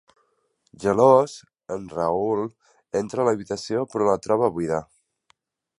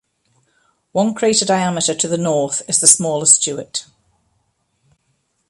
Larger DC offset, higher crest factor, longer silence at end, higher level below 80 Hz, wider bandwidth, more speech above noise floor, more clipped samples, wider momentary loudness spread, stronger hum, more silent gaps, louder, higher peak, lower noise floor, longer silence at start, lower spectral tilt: neither; about the same, 20 dB vs 18 dB; second, 0.95 s vs 1.65 s; about the same, -58 dBFS vs -62 dBFS; second, 11.5 kHz vs 16 kHz; about the same, 47 dB vs 50 dB; neither; about the same, 15 LU vs 13 LU; neither; neither; second, -23 LUFS vs -15 LUFS; about the same, -2 dBFS vs 0 dBFS; about the same, -69 dBFS vs -66 dBFS; second, 0.8 s vs 0.95 s; first, -6.5 dB/octave vs -2.5 dB/octave